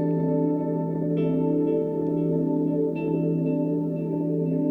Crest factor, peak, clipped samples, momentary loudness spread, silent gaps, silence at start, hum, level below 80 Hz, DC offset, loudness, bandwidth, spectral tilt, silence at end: 10 dB; -14 dBFS; under 0.1%; 3 LU; none; 0 s; none; -64 dBFS; under 0.1%; -25 LUFS; 3.5 kHz; -12 dB/octave; 0 s